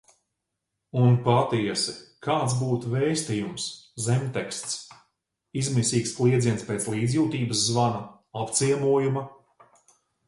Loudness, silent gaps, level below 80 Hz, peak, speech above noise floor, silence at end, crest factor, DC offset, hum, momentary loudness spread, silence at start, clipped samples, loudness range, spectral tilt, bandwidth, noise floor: -25 LUFS; none; -60 dBFS; -6 dBFS; 58 dB; 0.95 s; 20 dB; under 0.1%; none; 11 LU; 0.95 s; under 0.1%; 3 LU; -5 dB/octave; 11.5 kHz; -82 dBFS